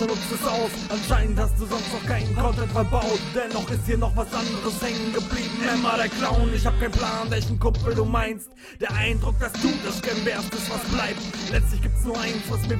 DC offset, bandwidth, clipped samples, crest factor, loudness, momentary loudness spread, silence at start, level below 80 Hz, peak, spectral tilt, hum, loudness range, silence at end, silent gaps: under 0.1%; 16.5 kHz; under 0.1%; 16 dB; -25 LUFS; 4 LU; 0 s; -28 dBFS; -8 dBFS; -5 dB/octave; none; 2 LU; 0 s; none